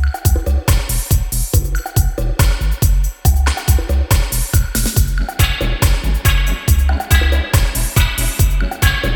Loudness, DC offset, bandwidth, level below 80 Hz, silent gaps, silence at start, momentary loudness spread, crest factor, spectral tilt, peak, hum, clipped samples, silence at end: -16 LUFS; under 0.1%; over 20 kHz; -16 dBFS; none; 0 s; 3 LU; 14 dB; -4 dB/octave; 0 dBFS; none; under 0.1%; 0 s